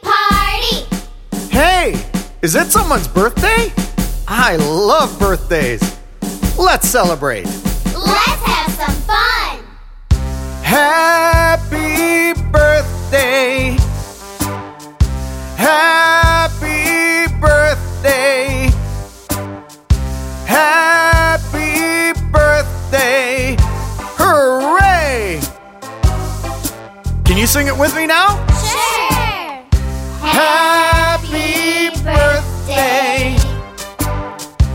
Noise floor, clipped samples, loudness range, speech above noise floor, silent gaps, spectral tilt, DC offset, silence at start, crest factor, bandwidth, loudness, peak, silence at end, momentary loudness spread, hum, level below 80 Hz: -33 dBFS; under 0.1%; 3 LU; 21 dB; none; -4 dB/octave; under 0.1%; 0.05 s; 14 dB; 16.5 kHz; -13 LUFS; 0 dBFS; 0 s; 12 LU; none; -22 dBFS